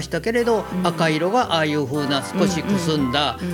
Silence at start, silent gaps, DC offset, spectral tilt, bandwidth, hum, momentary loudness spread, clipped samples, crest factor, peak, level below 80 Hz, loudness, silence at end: 0 s; none; under 0.1%; -5 dB/octave; 17.5 kHz; none; 3 LU; under 0.1%; 16 dB; -4 dBFS; -46 dBFS; -20 LUFS; 0 s